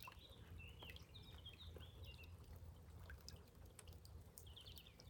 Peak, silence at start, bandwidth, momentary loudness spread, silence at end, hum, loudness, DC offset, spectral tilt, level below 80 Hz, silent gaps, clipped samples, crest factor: -34 dBFS; 0 s; 19 kHz; 4 LU; 0 s; none; -60 LUFS; under 0.1%; -4 dB/octave; -64 dBFS; none; under 0.1%; 24 dB